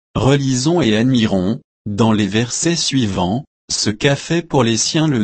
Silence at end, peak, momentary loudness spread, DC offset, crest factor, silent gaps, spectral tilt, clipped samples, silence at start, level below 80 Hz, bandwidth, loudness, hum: 0 s; -2 dBFS; 7 LU; under 0.1%; 14 dB; 1.64-1.85 s, 3.47-3.68 s; -4.5 dB/octave; under 0.1%; 0.15 s; -42 dBFS; 8.8 kHz; -16 LUFS; none